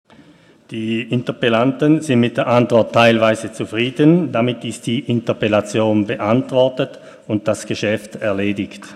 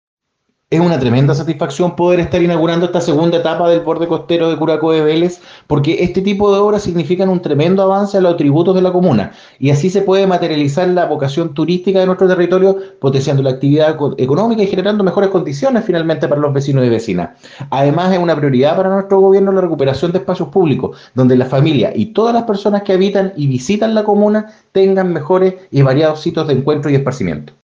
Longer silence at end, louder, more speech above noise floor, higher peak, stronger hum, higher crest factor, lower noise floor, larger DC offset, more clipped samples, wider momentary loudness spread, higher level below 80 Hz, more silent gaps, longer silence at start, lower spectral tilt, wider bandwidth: second, 0 s vs 0.15 s; second, -17 LUFS vs -13 LUFS; second, 31 dB vs 56 dB; about the same, 0 dBFS vs 0 dBFS; neither; about the same, 16 dB vs 12 dB; second, -47 dBFS vs -68 dBFS; neither; neither; first, 9 LU vs 5 LU; second, -60 dBFS vs -48 dBFS; neither; about the same, 0.7 s vs 0.7 s; second, -6 dB/octave vs -7.5 dB/octave; first, 13 kHz vs 7.6 kHz